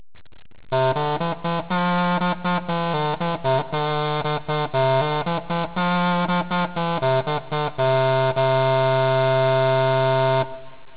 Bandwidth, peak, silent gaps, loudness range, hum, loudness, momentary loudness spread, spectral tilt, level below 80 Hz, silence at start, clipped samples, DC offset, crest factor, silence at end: 4 kHz; -8 dBFS; none; 3 LU; none; -21 LUFS; 6 LU; -10.5 dB/octave; -54 dBFS; 0.65 s; under 0.1%; 1%; 12 dB; 0.2 s